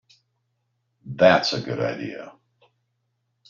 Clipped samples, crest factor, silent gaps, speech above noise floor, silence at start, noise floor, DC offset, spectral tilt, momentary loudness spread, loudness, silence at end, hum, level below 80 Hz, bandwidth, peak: under 0.1%; 24 dB; none; 53 dB; 1.05 s; -74 dBFS; under 0.1%; -3 dB/octave; 21 LU; -21 LUFS; 1.2 s; none; -64 dBFS; 7.4 kHz; -2 dBFS